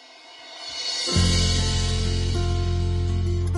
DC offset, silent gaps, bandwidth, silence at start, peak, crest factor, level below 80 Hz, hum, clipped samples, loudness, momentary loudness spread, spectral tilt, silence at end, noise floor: under 0.1%; none; 11.5 kHz; 0.05 s; -8 dBFS; 16 dB; -30 dBFS; none; under 0.1%; -23 LUFS; 16 LU; -4.5 dB/octave; 0 s; -45 dBFS